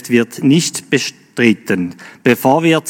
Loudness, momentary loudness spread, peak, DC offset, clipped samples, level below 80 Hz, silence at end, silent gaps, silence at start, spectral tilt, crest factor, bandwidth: -15 LUFS; 7 LU; 0 dBFS; under 0.1%; under 0.1%; -64 dBFS; 0 s; none; 0.05 s; -5 dB/octave; 14 dB; 18 kHz